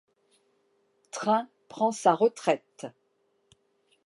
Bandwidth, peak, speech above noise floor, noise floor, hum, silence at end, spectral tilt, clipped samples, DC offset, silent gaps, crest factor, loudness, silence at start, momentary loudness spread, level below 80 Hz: 11.5 kHz; -8 dBFS; 46 dB; -72 dBFS; none; 1.15 s; -4.5 dB/octave; under 0.1%; under 0.1%; none; 22 dB; -27 LUFS; 1.15 s; 20 LU; -84 dBFS